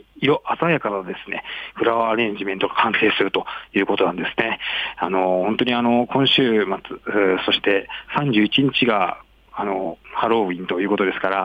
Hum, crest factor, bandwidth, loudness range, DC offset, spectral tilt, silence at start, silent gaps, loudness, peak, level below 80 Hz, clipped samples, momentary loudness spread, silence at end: none; 16 dB; 8.2 kHz; 2 LU; under 0.1%; -7 dB/octave; 0.15 s; none; -20 LUFS; -4 dBFS; -56 dBFS; under 0.1%; 10 LU; 0 s